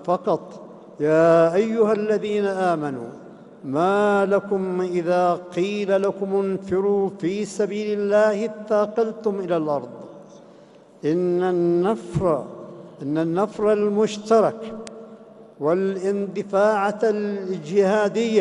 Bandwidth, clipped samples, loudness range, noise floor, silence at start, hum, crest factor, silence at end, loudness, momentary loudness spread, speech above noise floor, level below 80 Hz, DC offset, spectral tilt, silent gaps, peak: 11 kHz; under 0.1%; 3 LU; -49 dBFS; 0 s; none; 16 dB; 0 s; -22 LUFS; 15 LU; 28 dB; -60 dBFS; under 0.1%; -6.5 dB/octave; none; -4 dBFS